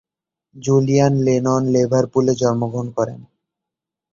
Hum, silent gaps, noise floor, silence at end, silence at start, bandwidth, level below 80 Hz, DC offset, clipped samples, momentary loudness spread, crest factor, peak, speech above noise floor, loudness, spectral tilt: none; none; -85 dBFS; 0.9 s; 0.55 s; 7.6 kHz; -54 dBFS; under 0.1%; under 0.1%; 8 LU; 16 dB; -4 dBFS; 68 dB; -18 LUFS; -7 dB/octave